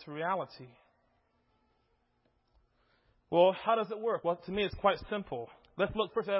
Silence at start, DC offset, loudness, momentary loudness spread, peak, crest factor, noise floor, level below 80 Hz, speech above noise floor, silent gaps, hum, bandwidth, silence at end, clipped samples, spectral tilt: 0 s; under 0.1%; -32 LUFS; 14 LU; -12 dBFS; 22 dB; -75 dBFS; -60 dBFS; 43 dB; none; none; 5.6 kHz; 0 s; under 0.1%; -3.5 dB/octave